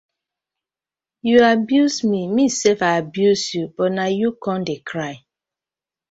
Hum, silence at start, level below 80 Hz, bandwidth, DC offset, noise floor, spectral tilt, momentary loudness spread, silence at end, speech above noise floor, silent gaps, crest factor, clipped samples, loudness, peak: none; 1.25 s; -62 dBFS; 8 kHz; under 0.1%; under -90 dBFS; -4.5 dB/octave; 12 LU; 0.95 s; over 72 dB; none; 18 dB; under 0.1%; -18 LUFS; -2 dBFS